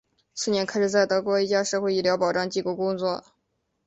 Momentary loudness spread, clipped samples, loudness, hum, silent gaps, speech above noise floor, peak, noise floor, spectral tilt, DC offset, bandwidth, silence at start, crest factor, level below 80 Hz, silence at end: 7 LU; under 0.1%; -24 LUFS; none; none; 51 dB; -8 dBFS; -75 dBFS; -4 dB/octave; under 0.1%; 8.2 kHz; 0.35 s; 16 dB; -66 dBFS; 0.65 s